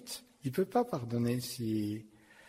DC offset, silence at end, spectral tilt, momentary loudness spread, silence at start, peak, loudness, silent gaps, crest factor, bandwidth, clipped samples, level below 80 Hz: under 0.1%; 0 s; -6 dB/octave; 9 LU; 0 s; -18 dBFS; -35 LUFS; none; 16 dB; 16 kHz; under 0.1%; -68 dBFS